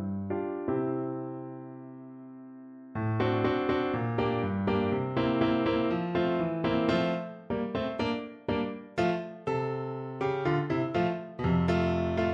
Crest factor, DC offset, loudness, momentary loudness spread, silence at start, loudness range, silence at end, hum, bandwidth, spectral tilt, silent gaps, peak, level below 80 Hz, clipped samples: 18 dB; under 0.1%; -30 LUFS; 14 LU; 0 s; 4 LU; 0 s; none; 7.8 kHz; -8 dB/octave; none; -12 dBFS; -54 dBFS; under 0.1%